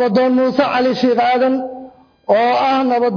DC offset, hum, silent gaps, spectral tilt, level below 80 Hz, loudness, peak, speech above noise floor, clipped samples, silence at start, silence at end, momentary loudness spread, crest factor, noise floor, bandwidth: under 0.1%; none; none; -6.5 dB/octave; -60 dBFS; -15 LUFS; 0 dBFS; 23 dB; under 0.1%; 0 s; 0 s; 11 LU; 14 dB; -37 dBFS; 5.4 kHz